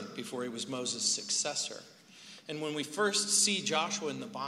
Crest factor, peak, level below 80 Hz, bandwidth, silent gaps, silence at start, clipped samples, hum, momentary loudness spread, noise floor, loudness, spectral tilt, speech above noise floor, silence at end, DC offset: 22 dB; -12 dBFS; -84 dBFS; 16 kHz; none; 0 s; under 0.1%; none; 15 LU; -54 dBFS; -31 LUFS; -1.5 dB/octave; 20 dB; 0 s; under 0.1%